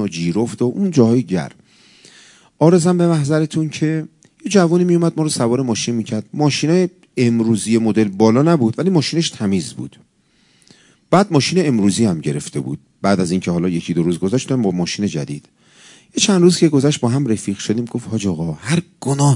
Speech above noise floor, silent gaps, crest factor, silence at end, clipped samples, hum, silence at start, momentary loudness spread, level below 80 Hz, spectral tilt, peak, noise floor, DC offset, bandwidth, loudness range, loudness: 41 dB; none; 16 dB; 0 s; under 0.1%; none; 0 s; 10 LU; -60 dBFS; -6 dB/octave; 0 dBFS; -57 dBFS; under 0.1%; 11 kHz; 3 LU; -17 LUFS